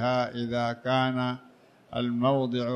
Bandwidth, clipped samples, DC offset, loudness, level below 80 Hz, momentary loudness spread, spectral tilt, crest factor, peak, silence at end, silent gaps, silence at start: 9.2 kHz; under 0.1%; under 0.1%; -28 LUFS; -64 dBFS; 7 LU; -7 dB/octave; 16 dB; -12 dBFS; 0 s; none; 0 s